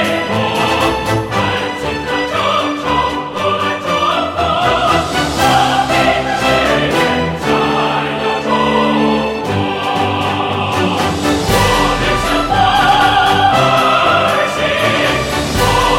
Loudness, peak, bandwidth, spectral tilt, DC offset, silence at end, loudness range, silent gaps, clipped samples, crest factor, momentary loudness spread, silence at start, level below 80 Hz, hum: -13 LUFS; 0 dBFS; 16.5 kHz; -4.5 dB/octave; under 0.1%; 0 s; 4 LU; none; under 0.1%; 12 dB; 6 LU; 0 s; -32 dBFS; none